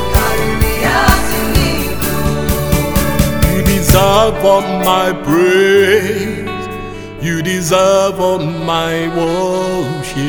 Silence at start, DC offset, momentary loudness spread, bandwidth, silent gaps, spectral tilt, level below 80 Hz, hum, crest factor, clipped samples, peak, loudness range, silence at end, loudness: 0 s; under 0.1%; 9 LU; over 20 kHz; none; -5 dB/octave; -22 dBFS; none; 12 dB; 0.2%; 0 dBFS; 4 LU; 0 s; -13 LUFS